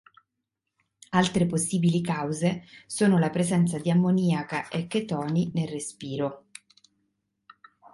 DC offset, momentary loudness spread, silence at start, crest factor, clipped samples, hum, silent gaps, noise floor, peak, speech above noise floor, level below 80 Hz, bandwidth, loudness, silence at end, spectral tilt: under 0.1%; 10 LU; 1.1 s; 18 dB; under 0.1%; none; none; -83 dBFS; -8 dBFS; 58 dB; -62 dBFS; 11.5 kHz; -26 LUFS; 1.55 s; -6 dB/octave